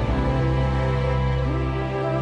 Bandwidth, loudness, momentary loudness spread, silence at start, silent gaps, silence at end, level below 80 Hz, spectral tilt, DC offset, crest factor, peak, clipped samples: 7.2 kHz; -23 LUFS; 3 LU; 0 s; none; 0 s; -28 dBFS; -8.5 dB/octave; under 0.1%; 10 dB; -12 dBFS; under 0.1%